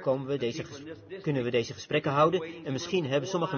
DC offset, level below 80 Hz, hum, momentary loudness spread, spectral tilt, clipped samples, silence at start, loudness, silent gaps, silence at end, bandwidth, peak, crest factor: under 0.1%; -68 dBFS; none; 13 LU; -5.5 dB/octave; under 0.1%; 0 s; -29 LUFS; none; 0 s; 6.8 kHz; -12 dBFS; 18 dB